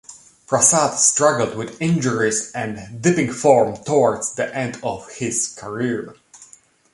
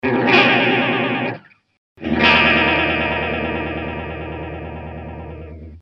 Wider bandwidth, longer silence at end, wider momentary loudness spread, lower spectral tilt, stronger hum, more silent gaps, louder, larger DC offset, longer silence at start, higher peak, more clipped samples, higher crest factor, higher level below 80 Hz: first, 11.5 kHz vs 7.2 kHz; first, 0.5 s vs 0 s; second, 13 LU vs 21 LU; second, -4 dB/octave vs -6 dB/octave; neither; second, none vs 1.77-1.96 s; second, -19 LUFS vs -16 LUFS; neither; about the same, 0.1 s vs 0.05 s; about the same, -2 dBFS vs 0 dBFS; neither; about the same, 18 dB vs 20 dB; second, -58 dBFS vs -38 dBFS